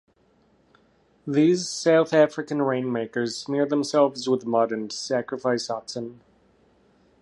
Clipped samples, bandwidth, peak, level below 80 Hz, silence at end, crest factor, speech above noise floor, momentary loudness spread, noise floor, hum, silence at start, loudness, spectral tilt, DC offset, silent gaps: under 0.1%; 11.5 kHz; -4 dBFS; -70 dBFS; 1.1 s; 20 dB; 39 dB; 10 LU; -62 dBFS; none; 1.25 s; -24 LUFS; -5 dB/octave; under 0.1%; none